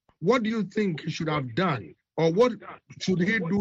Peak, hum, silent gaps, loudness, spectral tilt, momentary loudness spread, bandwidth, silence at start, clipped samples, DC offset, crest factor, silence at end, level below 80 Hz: -10 dBFS; none; none; -26 LUFS; -6.5 dB/octave; 10 LU; 7.8 kHz; 0.2 s; under 0.1%; under 0.1%; 18 dB; 0 s; -62 dBFS